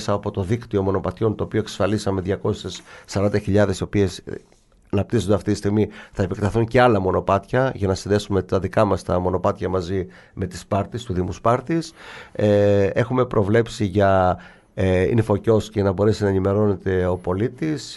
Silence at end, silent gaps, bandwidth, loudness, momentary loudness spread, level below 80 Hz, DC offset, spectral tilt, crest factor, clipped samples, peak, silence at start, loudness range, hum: 0 s; none; 12 kHz; -21 LUFS; 9 LU; -44 dBFS; under 0.1%; -7 dB/octave; 18 dB; under 0.1%; -4 dBFS; 0 s; 4 LU; none